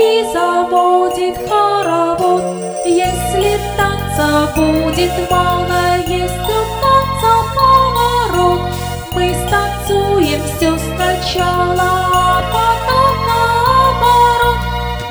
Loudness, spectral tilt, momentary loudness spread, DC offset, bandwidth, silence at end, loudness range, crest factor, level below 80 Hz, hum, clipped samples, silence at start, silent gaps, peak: -13 LUFS; -5 dB/octave; 6 LU; under 0.1%; over 20 kHz; 0 s; 3 LU; 14 dB; -28 dBFS; none; under 0.1%; 0 s; none; 0 dBFS